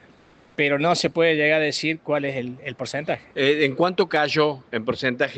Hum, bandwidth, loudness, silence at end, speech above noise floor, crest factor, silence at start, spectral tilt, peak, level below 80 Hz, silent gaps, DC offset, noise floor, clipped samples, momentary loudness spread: none; 9 kHz; -22 LUFS; 0 s; 31 dB; 16 dB; 0.6 s; -4.5 dB/octave; -6 dBFS; -62 dBFS; none; under 0.1%; -53 dBFS; under 0.1%; 10 LU